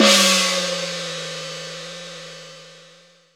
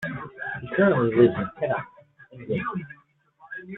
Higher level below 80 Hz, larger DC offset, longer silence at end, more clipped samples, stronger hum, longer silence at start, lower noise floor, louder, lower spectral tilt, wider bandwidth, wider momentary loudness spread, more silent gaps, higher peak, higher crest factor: second, -80 dBFS vs -60 dBFS; neither; first, 0.55 s vs 0 s; neither; neither; about the same, 0 s vs 0 s; second, -51 dBFS vs -56 dBFS; first, -19 LUFS vs -24 LUFS; second, -1.5 dB/octave vs -9.5 dB/octave; first, over 20 kHz vs 4.1 kHz; first, 24 LU vs 21 LU; neither; first, 0 dBFS vs -4 dBFS; about the same, 22 dB vs 20 dB